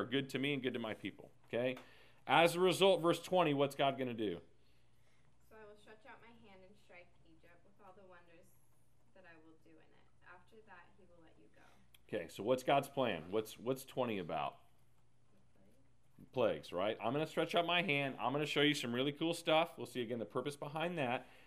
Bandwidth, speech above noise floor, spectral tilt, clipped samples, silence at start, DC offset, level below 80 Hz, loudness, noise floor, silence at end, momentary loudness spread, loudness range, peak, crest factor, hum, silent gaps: 15.5 kHz; 37 dB; -5 dB/octave; under 0.1%; 0 s; under 0.1%; -78 dBFS; -37 LUFS; -74 dBFS; 0.25 s; 13 LU; 10 LU; -14 dBFS; 24 dB; none; none